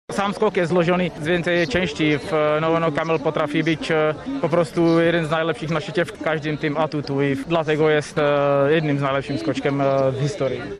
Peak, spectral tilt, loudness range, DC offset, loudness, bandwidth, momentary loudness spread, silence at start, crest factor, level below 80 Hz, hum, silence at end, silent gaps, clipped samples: -6 dBFS; -6.5 dB/octave; 1 LU; under 0.1%; -20 LUFS; 12 kHz; 5 LU; 0.1 s; 14 dB; -50 dBFS; none; 0 s; none; under 0.1%